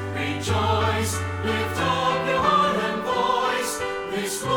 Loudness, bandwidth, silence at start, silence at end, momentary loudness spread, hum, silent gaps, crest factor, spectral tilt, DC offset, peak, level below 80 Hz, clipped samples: -23 LUFS; 19.5 kHz; 0 s; 0 s; 7 LU; none; none; 16 dB; -4 dB/octave; under 0.1%; -8 dBFS; -48 dBFS; under 0.1%